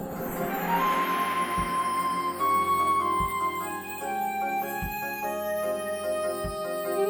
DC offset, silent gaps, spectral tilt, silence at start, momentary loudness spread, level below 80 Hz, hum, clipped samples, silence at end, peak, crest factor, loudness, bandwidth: under 0.1%; none; -4 dB/octave; 0 s; 8 LU; -50 dBFS; none; under 0.1%; 0 s; -14 dBFS; 14 dB; -28 LUFS; over 20 kHz